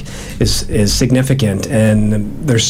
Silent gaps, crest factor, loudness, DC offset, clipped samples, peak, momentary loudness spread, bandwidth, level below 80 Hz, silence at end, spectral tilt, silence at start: none; 12 dB; -14 LUFS; under 0.1%; under 0.1%; -2 dBFS; 6 LU; 16 kHz; -26 dBFS; 0 s; -5 dB/octave; 0 s